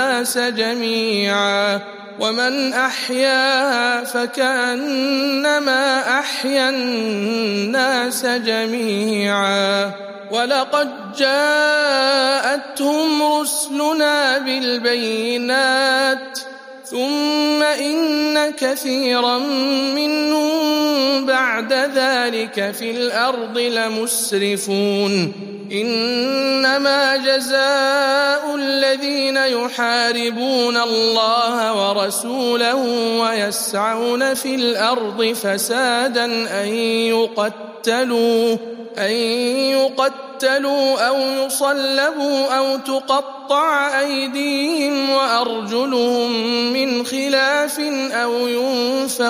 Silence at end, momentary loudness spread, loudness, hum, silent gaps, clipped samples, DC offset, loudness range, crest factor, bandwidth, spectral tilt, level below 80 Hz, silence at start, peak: 0 s; 5 LU; -17 LUFS; none; none; under 0.1%; under 0.1%; 2 LU; 16 dB; 15.5 kHz; -2.5 dB/octave; -76 dBFS; 0 s; -2 dBFS